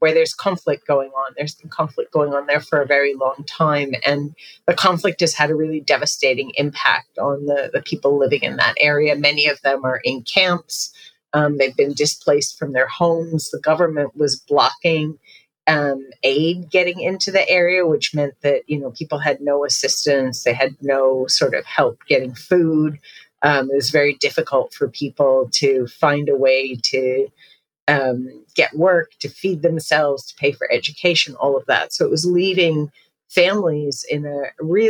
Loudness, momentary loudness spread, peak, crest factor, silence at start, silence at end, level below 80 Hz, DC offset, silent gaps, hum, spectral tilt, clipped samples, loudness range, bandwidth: -18 LUFS; 8 LU; 0 dBFS; 18 dB; 0 s; 0 s; -66 dBFS; under 0.1%; 27.82-27.87 s; none; -4 dB/octave; under 0.1%; 2 LU; 19.5 kHz